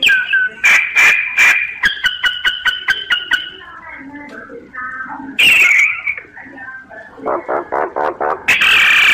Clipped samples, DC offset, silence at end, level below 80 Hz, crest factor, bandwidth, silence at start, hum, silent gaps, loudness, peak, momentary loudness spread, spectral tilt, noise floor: under 0.1%; under 0.1%; 0 s; -50 dBFS; 14 dB; 15.5 kHz; 0 s; none; none; -11 LUFS; -2 dBFS; 24 LU; 0 dB/octave; -34 dBFS